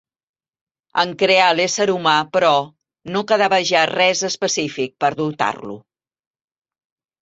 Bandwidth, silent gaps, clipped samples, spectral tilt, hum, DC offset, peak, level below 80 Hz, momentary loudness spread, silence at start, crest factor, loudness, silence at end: 8 kHz; none; under 0.1%; -3 dB/octave; none; under 0.1%; -2 dBFS; -64 dBFS; 11 LU; 0.95 s; 18 dB; -17 LUFS; 1.45 s